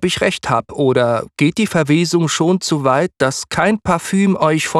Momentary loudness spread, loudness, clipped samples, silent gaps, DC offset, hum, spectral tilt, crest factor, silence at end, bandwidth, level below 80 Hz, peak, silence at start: 3 LU; -16 LUFS; under 0.1%; none; under 0.1%; none; -5 dB/octave; 14 dB; 0 s; 13.5 kHz; -48 dBFS; -2 dBFS; 0 s